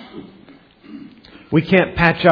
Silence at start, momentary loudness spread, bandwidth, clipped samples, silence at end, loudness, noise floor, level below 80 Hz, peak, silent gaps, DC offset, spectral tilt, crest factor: 0 s; 24 LU; 5.4 kHz; under 0.1%; 0 s; -16 LUFS; -46 dBFS; -42 dBFS; 0 dBFS; none; under 0.1%; -8.5 dB/octave; 18 dB